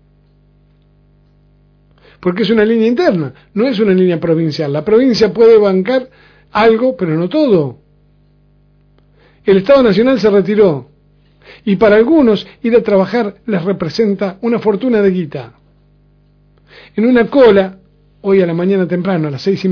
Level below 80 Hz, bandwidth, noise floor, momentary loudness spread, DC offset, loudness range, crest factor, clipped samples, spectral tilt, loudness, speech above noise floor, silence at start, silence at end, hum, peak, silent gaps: -48 dBFS; 5.4 kHz; -50 dBFS; 11 LU; under 0.1%; 5 LU; 14 dB; under 0.1%; -8 dB/octave; -12 LUFS; 38 dB; 2.2 s; 0 s; 50 Hz at -40 dBFS; 0 dBFS; none